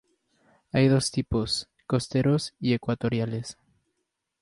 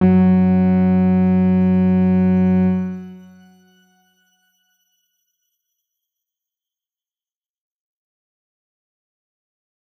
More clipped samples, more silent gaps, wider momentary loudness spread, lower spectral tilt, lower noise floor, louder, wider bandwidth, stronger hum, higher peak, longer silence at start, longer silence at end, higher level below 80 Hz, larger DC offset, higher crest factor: neither; neither; about the same, 8 LU vs 6 LU; second, -5.5 dB/octave vs -11.5 dB/octave; second, -80 dBFS vs under -90 dBFS; second, -26 LUFS vs -15 LUFS; first, 11.5 kHz vs 3.1 kHz; neither; second, -8 dBFS vs -4 dBFS; first, 0.75 s vs 0 s; second, 0.9 s vs 6.8 s; first, -50 dBFS vs -62 dBFS; neither; about the same, 18 dB vs 14 dB